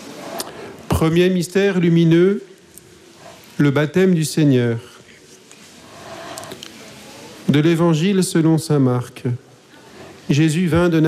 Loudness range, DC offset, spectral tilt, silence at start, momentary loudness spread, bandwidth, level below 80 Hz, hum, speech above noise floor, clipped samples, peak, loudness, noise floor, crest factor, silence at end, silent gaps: 5 LU; under 0.1%; -6.5 dB/octave; 0 s; 20 LU; 15.5 kHz; -46 dBFS; none; 30 dB; under 0.1%; -6 dBFS; -17 LUFS; -45 dBFS; 12 dB; 0 s; none